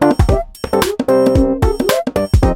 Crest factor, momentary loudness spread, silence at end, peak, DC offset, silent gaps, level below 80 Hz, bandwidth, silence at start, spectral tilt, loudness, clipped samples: 12 dB; 5 LU; 0 s; 0 dBFS; under 0.1%; none; -20 dBFS; 16 kHz; 0 s; -6.5 dB/octave; -15 LUFS; under 0.1%